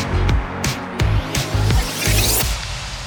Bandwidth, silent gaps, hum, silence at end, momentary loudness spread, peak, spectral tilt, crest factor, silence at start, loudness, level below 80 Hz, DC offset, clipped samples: over 20 kHz; none; none; 0 s; 7 LU; -4 dBFS; -3.5 dB/octave; 16 dB; 0 s; -19 LUFS; -24 dBFS; under 0.1%; under 0.1%